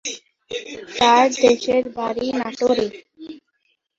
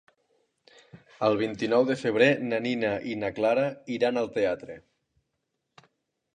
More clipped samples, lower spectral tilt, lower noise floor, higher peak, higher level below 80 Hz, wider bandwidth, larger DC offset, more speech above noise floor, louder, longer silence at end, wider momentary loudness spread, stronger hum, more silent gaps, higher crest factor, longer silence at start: neither; second, -2.5 dB/octave vs -6 dB/octave; second, -69 dBFS vs -80 dBFS; first, -2 dBFS vs -8 dBFS; first, -58 dBFS vs -66 dBFS; second, 7.8 kHz vs 10 kHz; neither; about the same, 51 dB vs 54 dB; first, -19 LUFS vs -26 LUFS; second, 0.6 s vs 1.55 s; first, 24 LU vs 8 LU; neither; neither; about the same, 18 dB vs 20 dB; second, 0.05 s vs 0.95 s